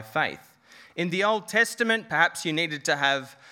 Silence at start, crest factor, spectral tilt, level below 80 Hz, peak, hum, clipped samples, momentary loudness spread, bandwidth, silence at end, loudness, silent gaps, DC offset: 0 s; 20 dB; -3 dB/octave; -76 dBFS; -6 dBFS; none; under 0.1%; 8 LU; 18 kHz; 0 s; -25 LUFS; none; under 0.1%